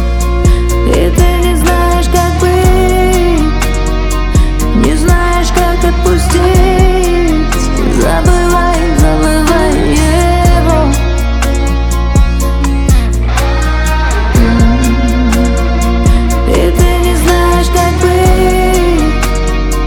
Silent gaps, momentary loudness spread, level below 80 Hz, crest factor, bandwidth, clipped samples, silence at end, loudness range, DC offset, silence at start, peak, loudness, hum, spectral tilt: none; 4 LU; -10 dBFS; 8 dB; 17.5 kHz; under 0.1%; 0 s; 1 LU; under 0.1%; 0 s; 0 dBFS; -10 LUFS; none; -5.5 dB/octave